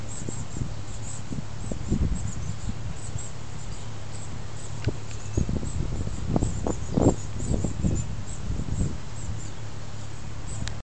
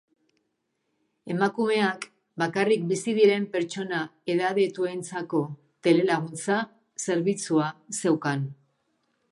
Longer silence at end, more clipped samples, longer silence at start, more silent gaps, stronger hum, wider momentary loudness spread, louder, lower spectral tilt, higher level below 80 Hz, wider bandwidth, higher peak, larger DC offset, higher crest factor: second, 0 s vs 0.8 s; neither; second, 0 s vs 1.25 s; neither; neither; about the same, 11 LU vs 11 LU; second, -32 LUFS vs -26 LUFS; about the same, -6 dB/octave vs -5 dB/octave; first, -36 dBFS vs -78 dBFS; second, 9.2 kHz vs 11.5 kHz; about the same, -6 dBFS vs -8 dBFS; first, 3% vs under 0.1%; first, 24 dB vs 18 dB